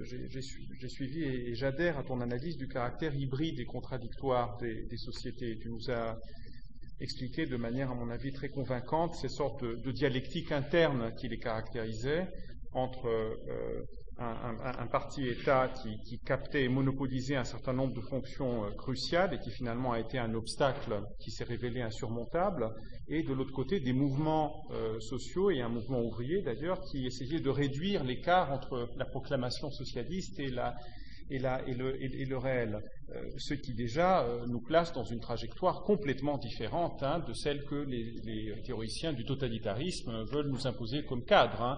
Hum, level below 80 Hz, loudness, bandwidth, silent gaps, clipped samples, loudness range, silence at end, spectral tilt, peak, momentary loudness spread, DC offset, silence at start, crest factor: none; -48 dBFS; -35 LUFS; 7.4 kHz; none; under 0.1%; 4 LU; 0 s; -5 dB/octave; -12 dBFS; 11 LU; 0.7%; 0 s; 22 dB